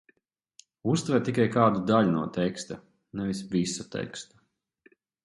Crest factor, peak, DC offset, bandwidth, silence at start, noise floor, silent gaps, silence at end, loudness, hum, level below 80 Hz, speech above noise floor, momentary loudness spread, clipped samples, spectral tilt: 22 dB; -8 dBFS; under 0.1%; 11.5 kHz; 0.85 s; -69 dBFS; none; 1 s; -27 LUFS; none; -62 dBFS; 42 dB; 18 LU; under 0.1%; -6 dB/octave